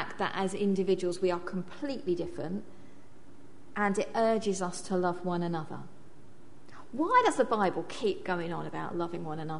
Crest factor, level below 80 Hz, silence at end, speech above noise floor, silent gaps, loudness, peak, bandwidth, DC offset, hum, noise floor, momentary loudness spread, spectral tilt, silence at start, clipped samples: 20 dB; -64 dBFS; 0 s; 25 dB; none; -31 LUFS; -12 dBFS; 10.5 kHz; 0.9%; none; -56 dBFS; 11 LU; -5.5 dB/octave; 0 s; under 0.1%